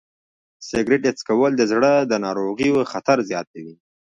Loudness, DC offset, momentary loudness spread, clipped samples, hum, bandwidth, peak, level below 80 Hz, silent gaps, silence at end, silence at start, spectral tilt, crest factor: -20 LUFS; under 0.1%; 11 LU; under 0.1%; none; 9.6 kHz; -4 dBFS; -58 dBFS; 3.47-3.54 s; 0.3 s; 0.6 s; -5 dB/octave; 16 dB